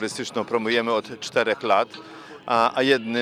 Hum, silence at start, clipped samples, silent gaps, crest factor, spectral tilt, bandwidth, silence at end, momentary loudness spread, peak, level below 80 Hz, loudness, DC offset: none; 0 s; under 0.1%; none; 18 dB; -3.5 dB/octave; 14.5 kHz; 0 s; 12 LU; -6 dBFS; -70 dBFS; -23 LUFS; under 0.1%